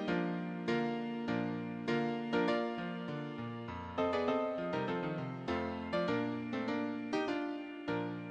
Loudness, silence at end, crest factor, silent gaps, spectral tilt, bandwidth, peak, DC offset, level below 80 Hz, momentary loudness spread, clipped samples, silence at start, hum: -37 LUFS; 0 s; 16 dB; none; -7 dB/octave; 8.8 kHz; -20 dBFS; under 0.1%; -68 dBFS; 7 LU; under 0.1%; 0 s; none